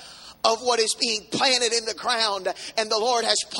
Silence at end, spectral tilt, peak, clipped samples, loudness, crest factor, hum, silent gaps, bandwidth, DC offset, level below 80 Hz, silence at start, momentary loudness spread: 0 s; -0.5 dB/octave; -2 dBFS; under 0.1%; -22 LUFS; 22 dB; none; none; 16 kHz; under 0.1%; -66 dBFS; 0 s; 7 LU